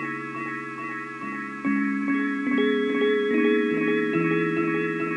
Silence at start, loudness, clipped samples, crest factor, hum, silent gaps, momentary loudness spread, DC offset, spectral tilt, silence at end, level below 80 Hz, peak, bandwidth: 0 s; -25 LUFS; under 0.1%; 14 dB; none; none; 10 LU; under 0.1%; -7 dB/octave; 0 s; -74 dBFS; -12 dBFS; 10.5 kHz